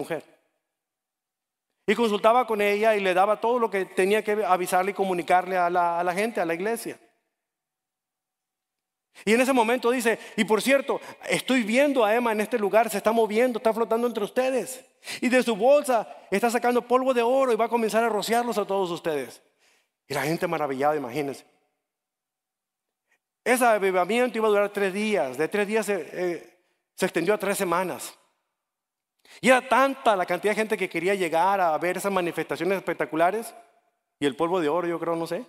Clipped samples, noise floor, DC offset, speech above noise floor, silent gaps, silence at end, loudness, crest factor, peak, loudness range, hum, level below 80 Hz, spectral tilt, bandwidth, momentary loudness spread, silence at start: under 0.1%; -87 dBFS; under 0.1%; 63 dB; none; 0.05 s; -24 LUFS; 20 dB; -4 dBFS; 6 LU; none; -70 dBFS; -4.5 dB/octave; 16 kHz; 9 LU; 0 s